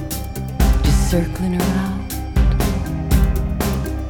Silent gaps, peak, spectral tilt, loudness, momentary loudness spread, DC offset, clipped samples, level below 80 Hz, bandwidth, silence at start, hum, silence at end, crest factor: none; -2 dBFS; -6 dB/octave; -20 LUFS; 8 LU; 0.4%; under 0.1%; -20 dBFS; 19 kHz; 0 s; none; 0 s; 16 dB